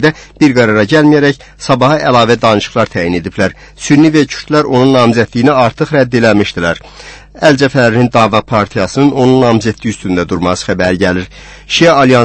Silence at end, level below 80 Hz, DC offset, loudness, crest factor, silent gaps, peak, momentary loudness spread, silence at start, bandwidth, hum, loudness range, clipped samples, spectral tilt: 0 s; -38 dBFS; under 0.1%; -10 LUFS; 10 dB; none; 0 dBFS; 8 LU; 0 s; 9 kHz; none; 1 LU; 0.6%; -5.5 dB/octave